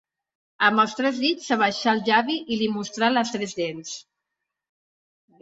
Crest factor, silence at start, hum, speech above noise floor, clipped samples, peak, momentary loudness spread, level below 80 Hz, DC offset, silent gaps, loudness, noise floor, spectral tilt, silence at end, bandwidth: 20 dB; 0.6 s; none; 60 dB; under 0.1%; -4 dBFS; 10 LU; -68 dBFS; under 0.1%; none; -23 LUFS; -83 dBFS; -3.5 dB/octave; 1.4 s; 7.8 kHz